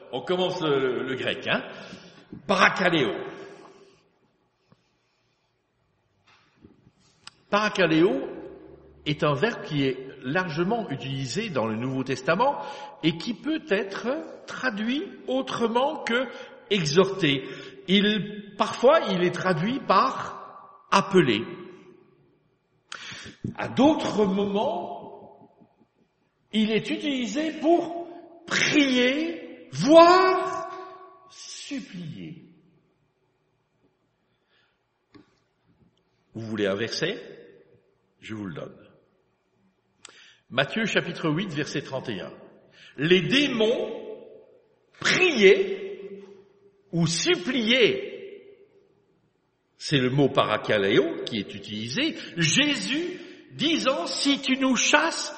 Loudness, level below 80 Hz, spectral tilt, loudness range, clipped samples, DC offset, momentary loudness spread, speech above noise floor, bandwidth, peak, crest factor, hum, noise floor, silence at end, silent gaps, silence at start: -24 LUFS; -66 dBFS; -4.5 dB/octave; 11 LU; under 0.1%; under 0.1%; 20 LU; 47 dB; 8.4 kHz; -2 dBFS; 24 dB; none; -71 dBFS; 0 s; none; 0 s